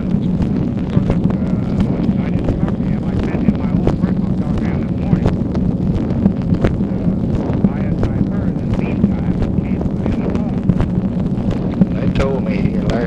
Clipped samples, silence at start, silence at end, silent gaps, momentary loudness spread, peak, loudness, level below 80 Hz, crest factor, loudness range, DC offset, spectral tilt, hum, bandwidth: under 0.1%; 0 s; 0 s; none; 3 LU; -2 dBFS; -17 LUFS; -26 dBFS; 14 dB; 1 LU; under 0.1%; -9.5 dB/octave; none; 7.6 kHz